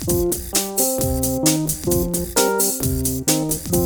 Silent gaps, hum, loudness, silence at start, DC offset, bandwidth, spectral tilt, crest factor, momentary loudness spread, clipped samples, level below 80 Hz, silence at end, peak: none; none; -19 LUFS; 0 s; under 0.1%; over 20 kHz; -4 dB/octave; 16 dB; 3 LU; under 0.1%; -34 dBFS; 0 s; -4 dBFS